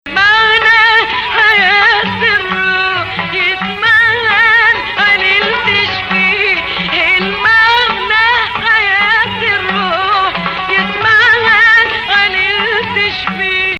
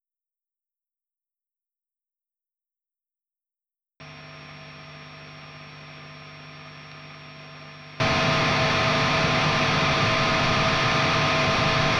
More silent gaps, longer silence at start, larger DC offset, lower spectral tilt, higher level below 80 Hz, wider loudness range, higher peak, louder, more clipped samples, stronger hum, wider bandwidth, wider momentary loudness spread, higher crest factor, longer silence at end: neither; second, 0.05 s vs 4 s; neither; about the same, -3.5 dB/octave vs -4.5 dB/octave; first, -40 dBFS vs -46 dBFS; second, 1 LU vs 23 LU; first, 0 dBFS vs -10 dBFS; first, -9 LUFS vs -21 LUFS; neither; neither; about the same, 9.8 kHz vs 10 kHz; second, 6 LU vs 21 LU; second, 10 dB vs 16 dB; about the same, 0 s vs 0 s